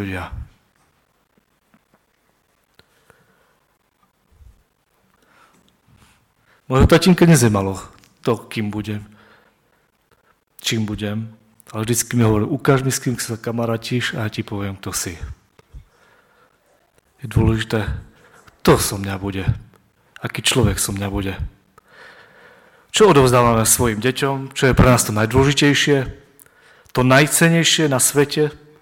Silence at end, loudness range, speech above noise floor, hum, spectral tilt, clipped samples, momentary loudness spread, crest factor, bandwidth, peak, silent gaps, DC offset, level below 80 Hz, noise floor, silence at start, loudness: 0.25 s; 11 LU; 46 dB; none; -4.5 dB/octave; under 0.1%; 17 LU; 18 dB; 17.5 kHz; 0 dBFS; none; under 0.1%; -36 dBFS; -63 dBFS; 0 s; -17 LUFS